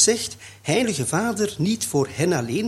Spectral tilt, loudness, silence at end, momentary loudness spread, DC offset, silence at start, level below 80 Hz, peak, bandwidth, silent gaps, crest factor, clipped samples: -4 dB/octave; -23 LUFS; 0 s; 4 LU; under 0.1%; 0 s; -56 dBFS; -4 dBFS; 16 kHz; none; 18 dB; under 0.1%